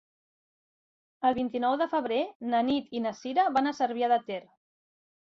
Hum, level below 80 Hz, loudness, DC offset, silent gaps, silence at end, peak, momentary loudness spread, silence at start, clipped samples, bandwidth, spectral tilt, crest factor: none; -70 dBFS; -28 LUFS; under 0.1%; 2.35-2.40 s; 1 s; -14 dBFS; 6 LU; 1.2 s; under 0.1%; 7.4 kHz; -5 dB/octave; 16 dB